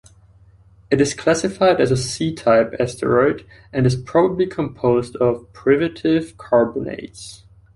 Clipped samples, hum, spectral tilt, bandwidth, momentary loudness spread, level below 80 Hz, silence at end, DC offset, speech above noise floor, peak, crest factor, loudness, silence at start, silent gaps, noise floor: under 0.1%; none; -6 dB/octave; 11.5 kHz; 11 LU; -48 dBFS; 0.4 s; under 0.1%; 31 dB; -2 dBFS; 16 dB; -19 LUFS; 0.9 s; none; -50 dBFS